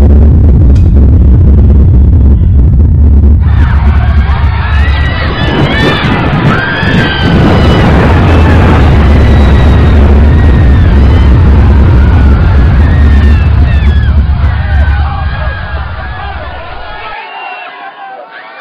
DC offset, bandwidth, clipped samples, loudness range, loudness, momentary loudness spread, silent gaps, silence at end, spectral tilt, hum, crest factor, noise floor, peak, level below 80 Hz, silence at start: 4%; 5.8 kHz; 1%; 7 LU; -6 LUFS; 15 LU; none; 0 s; -8 dB/octave; none; 4 dB; -25 dBFS; 0 dBFS; -8 dBFS; 0 s